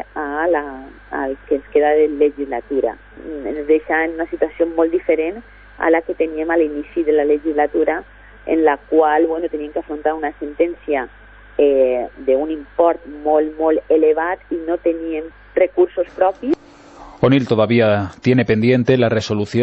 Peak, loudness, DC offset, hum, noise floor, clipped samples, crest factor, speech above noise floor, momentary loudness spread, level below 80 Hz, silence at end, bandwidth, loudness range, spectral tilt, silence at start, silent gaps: -2 dBFS; -18 LUFS; under 0.1%; none; -40 dBFS; under 0.1%; 16 dB; 23 dB; 11 LU; -46 dBFS; 0 s; 7.8 kHz; 3 LU; -7.5 dB/octave; 0 s; none